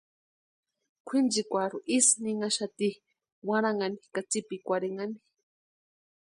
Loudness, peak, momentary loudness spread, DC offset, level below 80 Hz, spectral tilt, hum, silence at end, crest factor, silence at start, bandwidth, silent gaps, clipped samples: -29 LUFS; -10 dBFS; 14 LU; under 0.1%; -80 dBFS; -2.5 dB/octave; none; 1.2 s; 22 dB; 1.05 s; 11.5 kHz; 3.32-3.42 s; under 0.1%